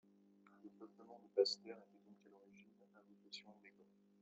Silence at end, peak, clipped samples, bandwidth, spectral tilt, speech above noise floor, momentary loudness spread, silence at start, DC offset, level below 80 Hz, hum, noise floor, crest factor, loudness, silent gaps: 0.5 s; -22 dBFS; under 0.1%; 7.4 kHz; -2 dB/octave; 25 dB; 28 LU; 0.65 s; under 0.1%; under -90 dBFS; 50 Hz at -70 dBFS; -70 dBFS; 26 dB; -43 LUFS; none